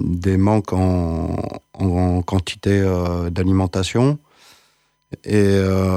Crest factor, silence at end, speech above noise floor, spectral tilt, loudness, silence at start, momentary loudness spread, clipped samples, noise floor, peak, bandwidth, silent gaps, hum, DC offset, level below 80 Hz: 14 dB; 0 s; 44 dB; -7 dB/octave; -19 LUFS; 0 s; 9 LU; under 0.1%; -61 dBFS; -4 dBFS; 12.5 kHz; none; none; under 0.1%; -38 dBFS